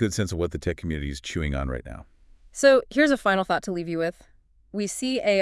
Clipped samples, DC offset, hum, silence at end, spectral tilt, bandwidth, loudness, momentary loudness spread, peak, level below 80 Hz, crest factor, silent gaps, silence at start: under 0.1%; under 0.1%; none; 0 s; -5 dB/octave; 12 kHz; -25 LUFS; 15 LU; -6 dBFS; -42 dBFS; 18 dB; none; 0 s